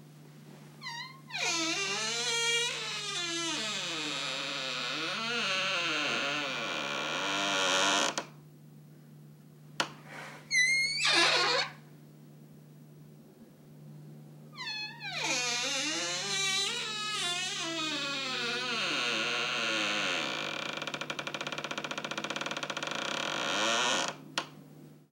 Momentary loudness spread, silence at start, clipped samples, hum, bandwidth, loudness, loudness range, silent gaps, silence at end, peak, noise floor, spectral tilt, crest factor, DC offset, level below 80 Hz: 11 LU; 0 s; under 0.1%; none; 16.5 kHz; -30 LUFS; 6 LU; none; 0.15 s; -12 dBFS; -55 dBFS; -1 dB/octave; 22 dB; under 0.1%; -82 dBFS